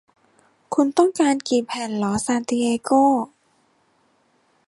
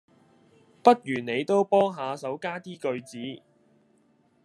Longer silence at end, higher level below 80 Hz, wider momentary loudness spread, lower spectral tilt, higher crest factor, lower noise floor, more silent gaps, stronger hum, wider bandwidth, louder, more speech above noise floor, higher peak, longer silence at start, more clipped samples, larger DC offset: first, 1.4 s vs 1.1 s; first, -60 dBFS vs -80 dBFS; second, 7 LU vs 17 LU; about the same, -4.5 dB/octave vs -5.5 dB/octave; second, 18 dB vs 26 dB; about the same, -63 dBFS vs -65 dBFS; neither; neither; about the same, 11.5 kHz vs 12 kHz; first, -20 LUFS vs -26 LUFS; first, 43 dB vs 39 dB; about the same, -4 dBFS vs -2 dBFS; second, 0.7 s vs 0.85 s; neither; neither